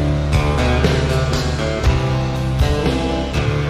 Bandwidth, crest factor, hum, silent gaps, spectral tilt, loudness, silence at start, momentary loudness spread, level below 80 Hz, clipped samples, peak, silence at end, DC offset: 14 kHz; 14 dB; none; none; -6 dB/octave; -18 LUFS; 0 s; 4 LU; -22 dBFS; under 0.1%; -2 dBFS; 0 s; under 0.1%